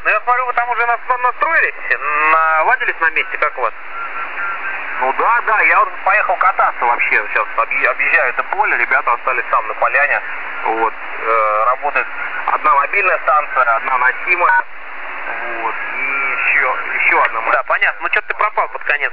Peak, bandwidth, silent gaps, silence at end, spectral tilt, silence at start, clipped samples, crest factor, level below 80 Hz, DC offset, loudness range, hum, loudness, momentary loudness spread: 0 dBFS; 5.2 kHz; none; 0 s; -5.5 dB/octave; 0 s; under 0.1%; 16 dB; -58 dBFS; 4%; 2 LU; none; -15 LUFS; 9 LU